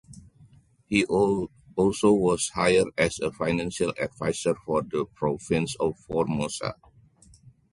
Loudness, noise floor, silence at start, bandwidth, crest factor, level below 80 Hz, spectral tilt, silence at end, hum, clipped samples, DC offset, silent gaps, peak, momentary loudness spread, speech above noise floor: -26 LUFS; -56 dBFS; 0.1 s; 11.5 kHz; 20 dB; -52 dBFS; -5 dB/octave; 1 s; none; under 0.1%; under 0.1%; none; -6 dBFS; 8 LU; 31 dB